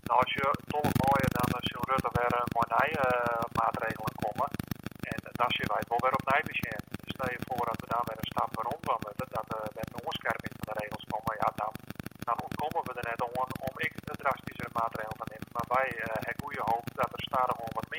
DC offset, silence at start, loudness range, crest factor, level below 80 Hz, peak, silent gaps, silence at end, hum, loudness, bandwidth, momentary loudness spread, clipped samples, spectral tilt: under 0.1%; 0.05 s; 6 LU; 22 dB; -56 dBFS; -10 dBFS; none; 0 s; none; -32 LUFS; 17 kHz; 10 LU; under 0.1%; -5.5 dB/octave